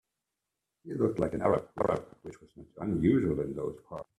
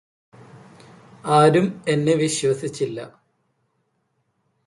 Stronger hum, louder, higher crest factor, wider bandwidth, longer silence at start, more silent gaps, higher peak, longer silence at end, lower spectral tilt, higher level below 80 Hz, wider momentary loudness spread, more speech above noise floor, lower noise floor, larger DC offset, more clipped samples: neither; second, -31 LUFS vs -20 LUFS; about the same, 20 dB vs 18 dB; about the same, 12 kHz vs 11.5 kHz; first, 0.85 s vs 0.55 s; neither; second, -12 dBFS vs -4 dBFS; second, 0.15 s vs 1.6 s; first, -9 dB/octave vs -5.5 dB/octave; first, -56 dBFS vs -66 dBFS; about the same, 18 LU vs 19 LU; first, 56 dB vs 51 dB; first, -87 dBFS vs -71 dBFS; neither; neither